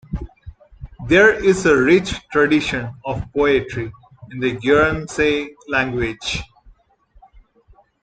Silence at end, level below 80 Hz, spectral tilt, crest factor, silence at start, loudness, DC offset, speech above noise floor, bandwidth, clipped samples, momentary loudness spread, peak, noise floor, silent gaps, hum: 1.6 s; -40 dBFS; -5 dB/octave; 18 dB; 0.1 s; -18 LUFS; under 0.1%; 37 dB; 9.4 kHz; under 0.1%; 16 LU; -2 dBFS; -54 dBFS; none; none